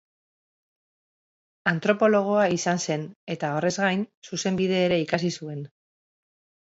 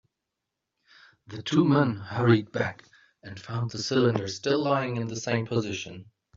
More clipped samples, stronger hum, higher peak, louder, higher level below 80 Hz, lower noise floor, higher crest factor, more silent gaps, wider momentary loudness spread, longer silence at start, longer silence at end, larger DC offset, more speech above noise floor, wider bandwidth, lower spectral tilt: neither; neither; about the same, -6 dBFS vs -8 dBFS; about the same, -25 LUFS vs -27 LUFS; about the same, -66 dBFS vs -64 dBFS; first, under -90 dBFS vs -85 dBFS; about the same, 20 dB vs 20 dB; first, 3.16-3.27 s, 4.17-4.22 s vs none; second, 13 LU vs 16 LU; first, 1.65 s vs 1.3 s; first, 1 s vs 0.35 s; neither; first, over 66 dB vs 59 dB; about the same, 8 kHz vs 7.6 kHz; about the same, -5 dB/octave vs -6 dB/octave